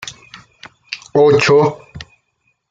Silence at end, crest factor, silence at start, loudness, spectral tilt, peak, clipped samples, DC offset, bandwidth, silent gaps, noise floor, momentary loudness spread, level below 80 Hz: 0.65 s; 16 dB; 0.05 s; -12 LUFS; -5.5 dB/octave; -2 dBFS; under 0.1%; under 0.1%; 7.8 kHz; none; -65 dBFS; 24 LU; -54 dBFS